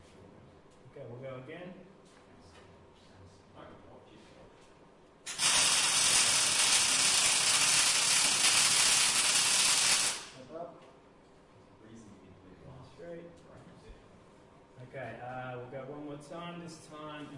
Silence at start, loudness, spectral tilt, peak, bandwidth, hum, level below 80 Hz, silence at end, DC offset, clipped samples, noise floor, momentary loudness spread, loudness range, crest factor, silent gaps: 0.2 s; -24 LUFS; 0.5 dB/octave; -12 dBFS; 12 kHz; none; -66 dBFS; 0 s; under 0.1%; under 0.1%; -59 dBFS; 23 LU; 22 LU; 20 dB; none